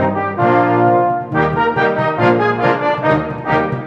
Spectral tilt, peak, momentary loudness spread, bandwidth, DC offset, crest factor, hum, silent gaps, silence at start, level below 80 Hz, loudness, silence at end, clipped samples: -8.5 dB/octave; 0 dBFS; 4 LU; 7.4 kHz; under 0.1%; 14 dB; none; none; 0 s; -44 dBFS; -15 LUFS; 0 s; under 0.1%